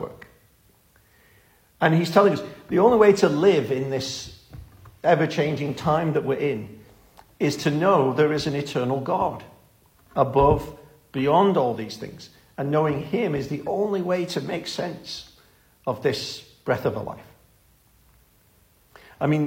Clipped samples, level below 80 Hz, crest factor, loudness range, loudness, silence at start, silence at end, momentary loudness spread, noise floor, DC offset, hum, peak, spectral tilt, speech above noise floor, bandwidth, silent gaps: under 0.1%; -50 dBFS; 22 dB; 9 LU; -23 LUFS; 0 s; 0 s; 16 LU; -59 dBFS; under 0.1%; none; -2 dBFS; -6 dB/octave; 37 dB; 16.5 kHz; none